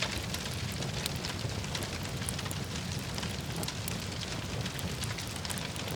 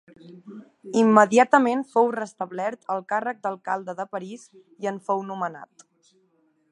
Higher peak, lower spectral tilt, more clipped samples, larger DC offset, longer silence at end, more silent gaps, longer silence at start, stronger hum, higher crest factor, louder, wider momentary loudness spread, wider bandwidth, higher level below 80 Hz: second, -10 dBFS vs -2 dBFS; second, -3.5 dB/octave vs -5.5 dB/octave; neither; neither; second, 0 s vs 1.1 s; neither; second, 0 s vs 0.25 s; neither; about the same, 26 dB vs 24 dB; second, -35 LUFS vs -23 LUFS; second, 2 LU vs 26 LU; first, over 20 kHz vs 10.5 kHz; first, -48 dBFS vs -80 dBFS